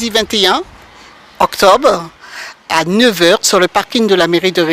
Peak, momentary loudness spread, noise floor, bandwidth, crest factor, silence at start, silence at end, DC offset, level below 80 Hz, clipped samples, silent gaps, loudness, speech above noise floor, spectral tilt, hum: 0 dBFS; 19 LU; -39 dBFS; 16.5 kHz; 12 dB; 0 s; 0 s; under 0.1%; -46 dBFS; 0.5%; none; -11 LUFS; 28 dB; -3 dB/octave; none